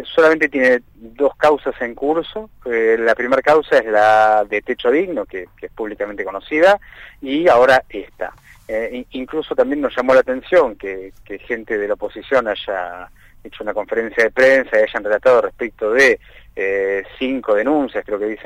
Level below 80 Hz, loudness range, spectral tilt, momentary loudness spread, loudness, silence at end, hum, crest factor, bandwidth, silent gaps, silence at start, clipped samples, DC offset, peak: -48 dBFS; 3 LU; -4.5 dB/octave; 16 LU; -17 LUFS; 0 s; none; 14 dB; 12 kHz; none; 0 s; under 0.1%; under 0.1%; -4 dBFS